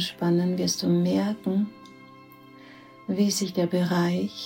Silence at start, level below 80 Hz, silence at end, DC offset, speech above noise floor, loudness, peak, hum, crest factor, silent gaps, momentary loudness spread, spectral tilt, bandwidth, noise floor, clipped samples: 0 s; -66 dBFS; 0 s; under 0.1%; 24 dB; -25 LUFS; -12 dBFS; none; 14 dB; none; 5 LU; -5.5 dB/octave; 16.5 kHz; -49 dBFS; under 0.1%